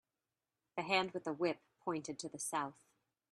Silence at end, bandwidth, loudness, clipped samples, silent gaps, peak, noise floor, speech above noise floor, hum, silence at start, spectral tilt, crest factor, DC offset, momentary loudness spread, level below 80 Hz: 0.6 s; 13 kHz; -40 LUFS; under 0.1%; none; -18 dBFS; under -90 dBFS; over 51 dB; none; 0.75 s; -3.5 dB/octave; 24 dB; under 0.1%; 11 LU; -84 dBFS